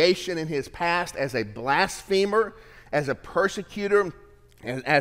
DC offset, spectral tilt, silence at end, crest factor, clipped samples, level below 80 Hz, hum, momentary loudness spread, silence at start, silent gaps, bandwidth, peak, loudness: under 0.1%; -4.5 dB/octave; 0 s; 18 dB; under 0.1%; -52 dBFS; none; 8 LU; 0 s; none; 16 kHz; -6 dBFS; -26 LUFS